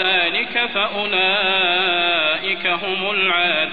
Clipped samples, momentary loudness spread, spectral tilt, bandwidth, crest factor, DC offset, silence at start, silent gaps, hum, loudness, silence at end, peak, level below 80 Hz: under 0.1%; 4 LU; -5 dB/octave; 5 kHz; 14 dB; 1%; 0 s; none; none; -17 LUFS; 0 s; -6 dBFS; -56 dBFS